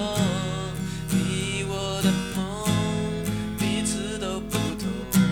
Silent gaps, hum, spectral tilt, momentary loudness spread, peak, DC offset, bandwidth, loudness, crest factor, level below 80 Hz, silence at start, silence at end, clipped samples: none; 50 Hz at -45 dBFS; -5 dB/octave; 5 LU; -8 dBFS; 0.1%; 20 kHz; -26 LUFS; 16 dB; -42 dBFS; 0 s; 0 s; under 0.1%